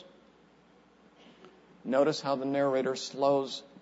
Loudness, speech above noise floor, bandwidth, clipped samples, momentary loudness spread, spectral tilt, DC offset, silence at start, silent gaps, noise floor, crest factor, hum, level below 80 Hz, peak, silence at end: -30 LUFS; 32 dB; 8 kHz; under 0.1%; 6 LU; -5 dB/octave; under 0.1%; 0 s; none; -61 dBFS; 18 dB; none; -80 dBFS; -14 dBFS; 0.15 s